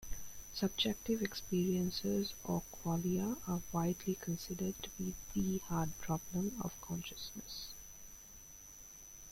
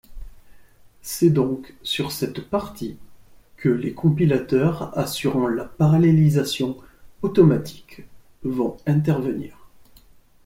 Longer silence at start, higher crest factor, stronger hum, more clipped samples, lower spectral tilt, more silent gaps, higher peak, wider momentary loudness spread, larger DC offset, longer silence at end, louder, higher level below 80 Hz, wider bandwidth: about the same, 0 s vs 0.1 s; about the same, 18 dB vs 18 dB; neither; neither; second, -5 dB/octave vs -7 dB/octave; neither; second, -20 dBFS vs -4 dBFS; about the same, 16 LU vs 15 LU; neither; second, 0 s vs 0.8 s; second, -39 LUFS vs -21 LUFS; second, -56 dBFS vs -48 dBFS; about the same, 16.5 kHz vs 16.5 kHz